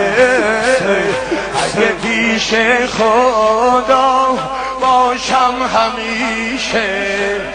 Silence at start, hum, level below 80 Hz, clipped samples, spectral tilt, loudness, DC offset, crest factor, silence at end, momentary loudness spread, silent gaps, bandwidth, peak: 0 s; none; -42 dBFS; under 0.1%; -3 dB/octave; -13 LUFS; under 0.1%; 14 dB; 0 s; 5 LU; none; 10 kHz; 0 dBFS